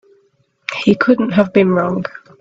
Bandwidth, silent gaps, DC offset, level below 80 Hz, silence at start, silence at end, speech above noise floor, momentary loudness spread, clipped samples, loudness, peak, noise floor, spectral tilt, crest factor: 7.8 kHz; none; under 0.1%; -54 dBFS; 0.7 s; 0.2 s; 45 dB; 13 LU; under 0.1%; -15 LUFS; 0 dBFS; -59 dBFS; -7.5 dB/octave; 16 dB